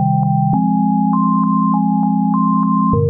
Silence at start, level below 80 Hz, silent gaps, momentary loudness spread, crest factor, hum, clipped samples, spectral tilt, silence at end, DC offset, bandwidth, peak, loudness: 0 s; -44 dBFS; none; 1 LU; 10 dB; none; under 0.1%; -15.5 dB/octave; 0 s; 0.1%; 1.6 kHz; -4 dBFS; -15 LUFS